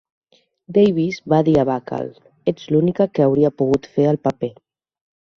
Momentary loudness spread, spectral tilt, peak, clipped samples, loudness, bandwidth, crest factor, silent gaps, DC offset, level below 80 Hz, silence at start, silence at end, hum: 12 LU; -8.5 dB/octave; -2 dBFS; under 0.1%; -19 LUFS; 7.2 kHz; 16 dB; none; under 0.1%; -52 dBFS; 0.7 s; 0.9 s; none